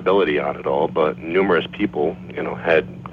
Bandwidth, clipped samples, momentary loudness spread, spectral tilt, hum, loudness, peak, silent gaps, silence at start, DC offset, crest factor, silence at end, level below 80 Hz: 6 kHz; under 0.1%; 7 LU; -8 dB/octave; none; -20 LUFS; -4 dBFS; none; 0 s; under 0.1%; 16 dB; 0 s; -50 dBFS